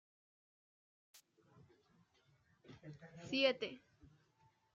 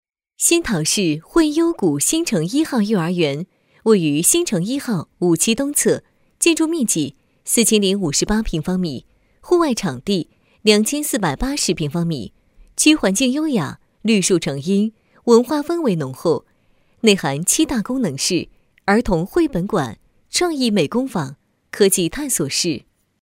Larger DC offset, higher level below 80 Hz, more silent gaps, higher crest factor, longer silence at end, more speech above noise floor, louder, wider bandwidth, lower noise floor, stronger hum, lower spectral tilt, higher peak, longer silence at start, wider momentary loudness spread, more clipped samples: neither; second, -84 dBFS vs -42 dBFS; neither; first, 26 dB vs 18 dB; first, 0.95 s vs 0.45 s; second, 35 dB vs 40 dB; second, -38 LUFS vs -18 LUFS; second, 13 kHz vs 16 kHz; first, -75 dBFS vs -58 dBFS; neither; about the same, -4.5 dB/octave vs -4 dB/octave; second, -20 dBFS vs 0 dBFS; first, 2.7 s vs 0.4 s; first, 24 LU vs 10 LU; neither